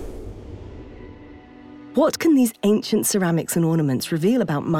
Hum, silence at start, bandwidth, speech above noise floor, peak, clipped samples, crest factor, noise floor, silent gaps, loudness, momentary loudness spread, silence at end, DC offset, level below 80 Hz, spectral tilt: none; 0 s; 18 kHz; 23 dB; -8 dBFS; under 0.1%; 14 dB; -43 dBFS; none; -20 LUFS; 22 LU; 0 s; under 0.1%; -46 dBFS; -5.5 dB/octave